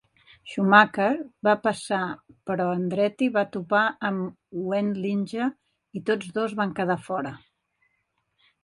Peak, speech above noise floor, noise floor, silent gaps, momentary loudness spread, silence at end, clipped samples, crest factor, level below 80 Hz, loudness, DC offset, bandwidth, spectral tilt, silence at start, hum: -2 dBFS; 50 dB; -74 dBFS; none; 13 LU; 1.25 s; under 0.1%; 24 dB; -68 dBFS; -25 LUFS; under 0.1%; 11.5 kHz; -6 dB/octave; 0.45 s; none